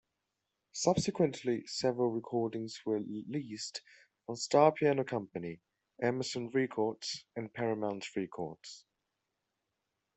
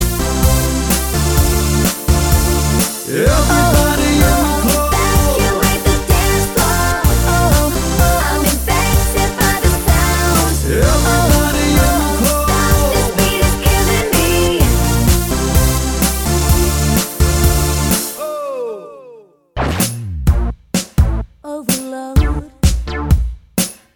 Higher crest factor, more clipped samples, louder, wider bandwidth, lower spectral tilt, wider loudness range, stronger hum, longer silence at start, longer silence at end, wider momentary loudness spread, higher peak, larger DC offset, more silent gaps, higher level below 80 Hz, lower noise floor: first, 22 dB vs 14 dB; neither; second, -34 LUFS vs -14 LUFS; second, 8.4 kHz vs 20 kHz; about the same, -5 dB/octave vs -4.5 dB/octave; about the same, 5 LU vs 5 LU; neither; first, 0.75 s vs 0 s; first, 1.35 s vs 0.2 s; first, 14 LU vs 7 LU; second, -12 dBFS vs 0 dBFS; neither; neither; second, -72 dBFS vs -18 dBFS; first, -86 dBFS vs -41 dBFS